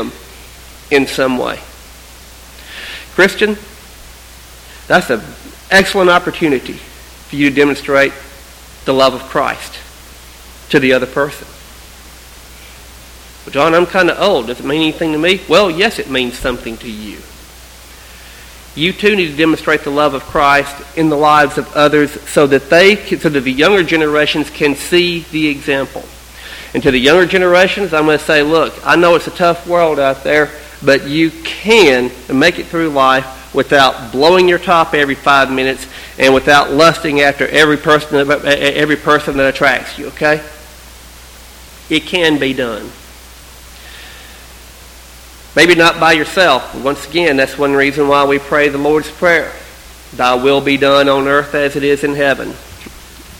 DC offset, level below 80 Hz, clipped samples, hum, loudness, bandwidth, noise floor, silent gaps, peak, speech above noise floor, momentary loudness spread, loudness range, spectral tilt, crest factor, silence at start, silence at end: under 0.1%; -38 dBFS; 0.2%; none; -12 LUFS; 18 kHz; -36 dBFS; none; 0 dBFS; 24 dB; 16 LU; 8 LU; -4.5 dB/octave; 14 dB; 0 s; 0.05 s